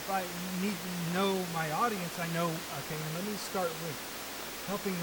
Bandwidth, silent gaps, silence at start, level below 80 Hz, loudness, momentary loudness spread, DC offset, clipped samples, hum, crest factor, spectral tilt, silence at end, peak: 19 kHz; none; 0 s; -64 dBFS; -34 LUFS; 7 LU; under 0.1%; under 0.1%; none; 16 dB; -4 dB/octave; 0 s; -18 dBFS